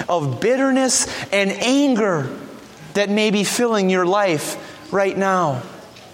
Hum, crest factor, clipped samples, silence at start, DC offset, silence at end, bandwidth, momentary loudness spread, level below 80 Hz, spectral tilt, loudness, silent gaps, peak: none; 16 dB; under 0.1%; 0 s; under 0.1%; 0.05 s; 16.5 kHz; 13 LU; -58 dBFS; -4 dB/octave; -18 LUFS; none; -4 dBFS